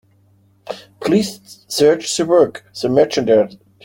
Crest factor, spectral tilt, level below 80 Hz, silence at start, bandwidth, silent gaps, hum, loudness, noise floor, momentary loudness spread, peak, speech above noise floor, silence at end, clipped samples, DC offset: 16 dB; -4.5 dB/octave; -56 dBFS; 0.65 s; 17 kHz; none; none; -16 LUFS; -54 dBFS; 18 LU; -2 dBFS; 39 dB; 0.3 s; under 0.1%; under 0.1%